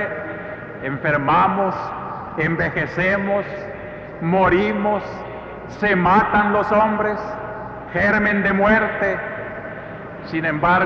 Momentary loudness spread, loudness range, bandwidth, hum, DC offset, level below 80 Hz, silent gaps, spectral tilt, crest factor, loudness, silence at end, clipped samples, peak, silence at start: 16 LU; 3 LU; 6.8 kHz; none; under 0.1%; -44 dBFS; none; -8 dB/octave; 14 dB; -19 LUFS; 0 s; under 0.1%; -6 dBFS; 0 s